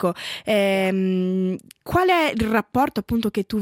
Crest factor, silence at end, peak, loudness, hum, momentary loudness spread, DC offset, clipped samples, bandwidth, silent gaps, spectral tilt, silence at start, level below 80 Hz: 16 dB; 0 s; -6 dBFS; -21 LUFS; none; 6 LU; under 0.1%; under 0.1%; 16.5 kHz; none; -6 dB/octave; 0 s; -46 dBFS